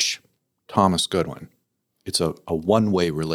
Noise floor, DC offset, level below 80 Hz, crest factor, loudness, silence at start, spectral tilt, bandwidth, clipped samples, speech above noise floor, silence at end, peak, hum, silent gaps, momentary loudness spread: -72 dBFS; under 0.1%; -56 dBFS; 22 dB; -22 LUFS; 0 s; -4.5 dB/octave; 17.5 kHz; under 0.1%; 51 dB; 0 s; -2 dBFS; none; none; 13 LU